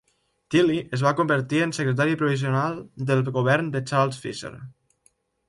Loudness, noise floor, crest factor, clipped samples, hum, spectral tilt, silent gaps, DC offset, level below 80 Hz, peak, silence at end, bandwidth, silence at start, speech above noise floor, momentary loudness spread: -23 LUFS; -65 dBFS; 16 dB; under 0.1%; none; -6.5 dB/octave; none; under 0.1%; -62 dBFS; -8 dBFS; 0.8 s; 11.5 kHz; 0.5 s; 42 dB; 11 LU